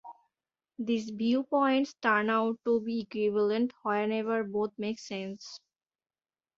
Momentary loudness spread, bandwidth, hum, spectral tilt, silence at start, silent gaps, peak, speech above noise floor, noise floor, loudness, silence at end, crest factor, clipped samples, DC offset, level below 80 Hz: 11 LU; 7.6 kHz; none; -5.5 dB/octave; 0.05 s; none; -12 dBFS; over 60 dB; under -90 dBFS; -30 LUFS; 1 s; 20 dB; under 0.1%; under 0.1%; -76 dBFS